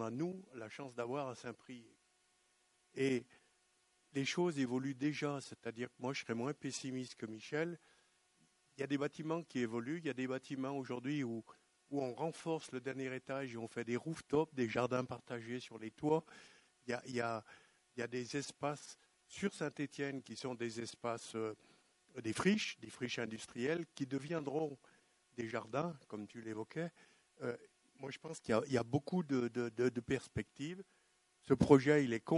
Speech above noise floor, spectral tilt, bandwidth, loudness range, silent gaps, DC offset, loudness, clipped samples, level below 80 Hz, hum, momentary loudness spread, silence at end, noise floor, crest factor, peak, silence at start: 37 dB; -5.5 dB/octave; 11.5 kHz; 5 LU; none; under 0.1%; -40 LUFS; under 0.1%; -70 dBFS; none; 13 LU; 0 s; -76 dBFS; 28 dB; -12 dBFS; 0 s